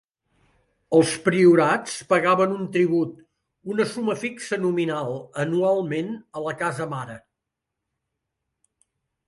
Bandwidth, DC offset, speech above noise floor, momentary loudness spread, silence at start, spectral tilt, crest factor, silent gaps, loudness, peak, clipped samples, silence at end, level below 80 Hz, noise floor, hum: 11.5 kHz; under 0.1%; 62 dB; 13 LU; 0.9 s; -5.5 dB/octave; 20 dB; none; -23 LUFS; -4 dBFS; under 0.1%; 2.1 s; -66 dBFS; -83 dBFS; none